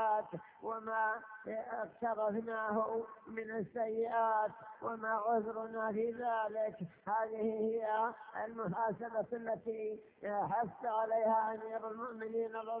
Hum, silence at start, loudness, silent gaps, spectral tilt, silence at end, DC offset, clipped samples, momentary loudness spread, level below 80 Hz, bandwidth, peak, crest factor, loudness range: none; 0 s; -38 LUFS; none; -5.5 dB/octave; 0 s; under 0.1%; under 0.1%; 10 LU; -78 dBFS; 3.8 kHz; -22 dBFS; 16 dB; 2 LU